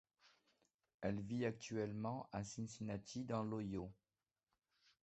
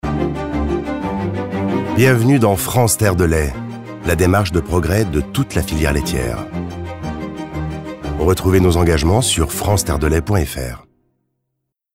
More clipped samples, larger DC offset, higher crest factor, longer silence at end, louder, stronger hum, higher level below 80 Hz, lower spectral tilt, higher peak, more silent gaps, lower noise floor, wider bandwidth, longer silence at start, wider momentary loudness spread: neither; neither; about the same, 18 dB vs 14 dB; about the same, 1.1 s vs 1.15 s; second, -46 LUFS vs -17 LUFS; neither; second, -70 dBFS vs -28 dBFS; about the same, -6 dB/octave vs -5.5 dB/octave; second, -28 dBFS vs -2 dBFS; first, 0.74-0.79 s, 0.94-0.99 s vs none; first, under -90 dBFS vs -76 dBFS; second, 8.2 kHz vs 16.5 kHz; first, 0.25 s vs 0.05 s; second, 5 LU vs 13 LU